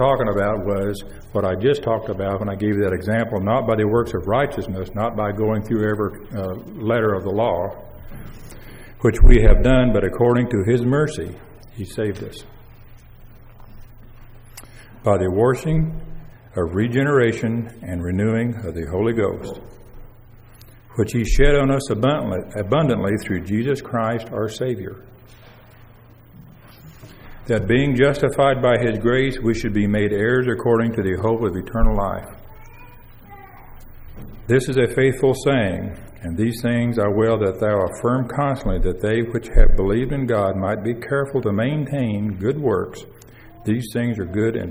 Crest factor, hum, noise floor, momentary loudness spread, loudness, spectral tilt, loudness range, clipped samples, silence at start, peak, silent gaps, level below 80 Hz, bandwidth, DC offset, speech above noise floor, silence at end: 20 dB; none; -46 dBFS; 14 LU; -20 LUFS; -7 dB/octave; 7 LU; under 0.1%; 0 s; 0 dBFS; none; -26 dBFS; 16 kHz; under 0.1%; 28 dB; 0 s